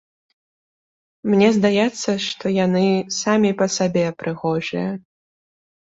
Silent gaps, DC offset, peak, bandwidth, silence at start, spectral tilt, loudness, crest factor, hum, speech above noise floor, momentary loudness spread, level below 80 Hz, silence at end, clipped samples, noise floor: none; under 0.1%; -4 dBFS; 8 kHz; 1.25 s; -5 dB/octave; -19 LUFS; 18 dB; none; over 71 dB; 9 LU; -62 dBFS; 0.95 s; under 0.1%; under -90 dBFS